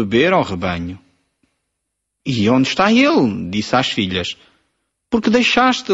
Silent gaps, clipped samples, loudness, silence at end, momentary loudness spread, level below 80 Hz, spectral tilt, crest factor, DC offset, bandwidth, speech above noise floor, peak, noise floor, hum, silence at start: none; under 0.1%; -16 LUFS; 0 s; 13 LU; -48 dBFS; -5 dB/octave; 16 dB; under 0.1%; 8 kHz; 60 dB; -2 dBFS; -76 dBFS; none; 0 s